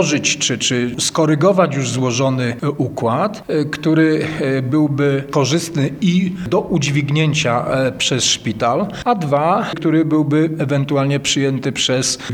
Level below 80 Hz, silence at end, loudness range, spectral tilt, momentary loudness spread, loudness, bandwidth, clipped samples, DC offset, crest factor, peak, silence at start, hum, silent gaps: -50 dBFS; 0 s; 1 LU; -4.5 dB/octave; 5 LU; -17 LUFS; 15 kHz; under 0.1%; under 0.1%; 16 dB; 0 dBFS; 0 s; none; none